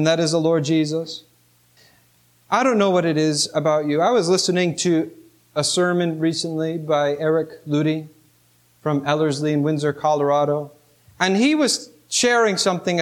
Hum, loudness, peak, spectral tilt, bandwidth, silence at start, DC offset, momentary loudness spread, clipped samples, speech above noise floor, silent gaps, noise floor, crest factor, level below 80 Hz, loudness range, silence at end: 60 Hz at -50 dBFS; -20 LUFS; -4 dBFS; -4.5 dB/octave; 15.5 kHz; 0 s; under 0.1%; 7 LU; under 0.1%; 39 dB; none; -58 dBFS; 16 dB; -68 dBFS; 3 LU; 0 s